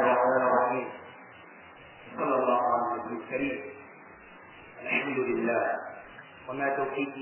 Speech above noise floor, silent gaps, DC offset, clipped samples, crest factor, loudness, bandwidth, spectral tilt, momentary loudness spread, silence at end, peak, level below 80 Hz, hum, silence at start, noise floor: 20 dB; none; under 0.1%; under 0.1%; 18 dB; -28 LUFS; 3.2 kHz; -3.5 dB/octave; 24 LU; 0 s; -12 dBFS; -68 dBFS; none; 0 s; -50 dBFS